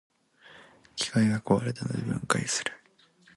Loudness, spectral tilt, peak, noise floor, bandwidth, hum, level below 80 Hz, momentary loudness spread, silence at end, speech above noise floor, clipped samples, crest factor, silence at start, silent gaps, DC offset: -28 LUFS; -4.5 dB/octave; -6 dBFS; -61 dBFS; 11.5 kHz; none; -60 dBFS; 8 LU; 0.6 s; 34 dB; under 0.1%; 24 dB; 0.5 s; none; under 0.1%